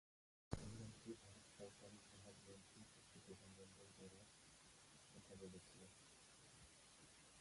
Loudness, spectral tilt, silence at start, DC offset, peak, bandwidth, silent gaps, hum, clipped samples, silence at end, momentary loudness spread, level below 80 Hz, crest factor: -61 LUFS; -4.5 dB/octave; 0.5 s; under 0.1%; -28 dBFS; 11.5 kHz; none; none; under 0.1%; 0 s; 9 LU; -72 dBFS; 32 dB